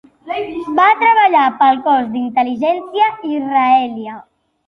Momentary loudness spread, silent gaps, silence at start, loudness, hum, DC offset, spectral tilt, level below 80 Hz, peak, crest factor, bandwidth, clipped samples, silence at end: 13 LU; none; 0.25 s; -14 LUFS; none; under 0.1%; -6 dB/octave; -60 dBFS; -2 dBFS; 14 dB; 6.2 kHz; under 0.1%; 0.45 s